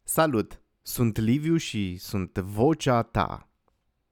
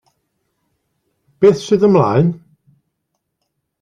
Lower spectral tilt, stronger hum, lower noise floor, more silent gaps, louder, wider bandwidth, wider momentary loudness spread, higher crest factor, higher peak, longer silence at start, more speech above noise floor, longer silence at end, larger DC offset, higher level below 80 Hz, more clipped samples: second, -5.5 dB/octave vs -7.5 dB/octave; neither; about the same, -72 dBFS vs -73 dBFS; neither; second, -26 LUFS vs -14 LUFS; first, over 20 kHz vs 9.6 kHz; first, 11 LU vs 7 LU; about the same, 18 dB vs 16 dB; second, -8 dBFS vs -2 dBFS; second, 0.05 s vs 1.4 s; second, 47 dB vs 61 dB; second, 0.75 s vs 1.45 s; neither; first, -48 dBFS vs -54 dBFS; neither